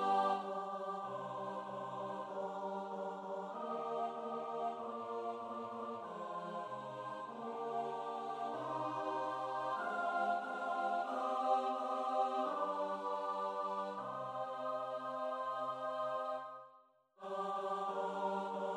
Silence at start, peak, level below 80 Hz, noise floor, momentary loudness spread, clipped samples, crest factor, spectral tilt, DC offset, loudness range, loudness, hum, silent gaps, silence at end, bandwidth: 0 s; -22 dBFS; -90 dBFS; -67 dBFS; 8 LU; under 0.1%; 18 dB; -5.5 dB/octave; under 0.1%; 6 LU; -40 LUFS; none; none; 0 s; 11.5 kHz